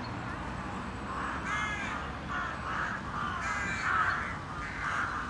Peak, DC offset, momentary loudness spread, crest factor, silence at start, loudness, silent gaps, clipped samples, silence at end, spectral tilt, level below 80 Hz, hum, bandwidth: -18 dBFS; under 0.1%; 9 LU; 16 dB; 0 s; -34 LUFS; none; under 0.1%; 0 s; -4.5 dB/octave; -48 dBFS; none; 11.5 kHz